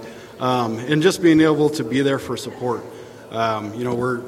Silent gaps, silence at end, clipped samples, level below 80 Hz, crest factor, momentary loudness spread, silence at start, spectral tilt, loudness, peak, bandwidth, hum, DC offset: none; 0 s; under 0.1%; -56 dBFS; 16 dB; 15 LU; 0 s; -5.5 dB/octave; -20 LUFS; -4 dBFS; 15 kHz; none; under 0.1%